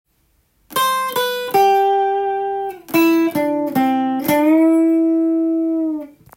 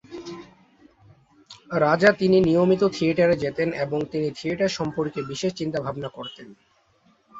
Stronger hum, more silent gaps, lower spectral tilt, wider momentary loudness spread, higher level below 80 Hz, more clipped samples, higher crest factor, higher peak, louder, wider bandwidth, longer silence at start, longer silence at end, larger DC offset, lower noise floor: neither; neither; second, -4.5 dB/octave vs -6 dB/octave; second, 8 LU vs 19 LU; about the same, -60 dBFS vs -58 dBFS; neither; second, 12 dB vs 20 dB; about the same, -4 dBFS vs -4 dBFS; first, -17 LUFS vs -23 LUFS; first, 17 kHz vs 8 kHz; first, 0.7 s vs 0.1 s; first, 0.3 s vs 0 s; neither; about the same, -62 dBFS vs -62 dBFS